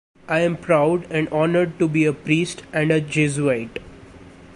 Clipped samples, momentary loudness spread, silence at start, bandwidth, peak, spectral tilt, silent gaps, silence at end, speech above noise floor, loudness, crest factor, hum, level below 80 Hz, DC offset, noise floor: under 0.1%; 6 LU; 0.3 s; 11.5 kHz; -4 dBFS; -6 dB/octave; none; 0.05 s; 23 dB; -20 LUFS; 16 dB; none; -52 dBFS; under 0.1%; -43 dBFS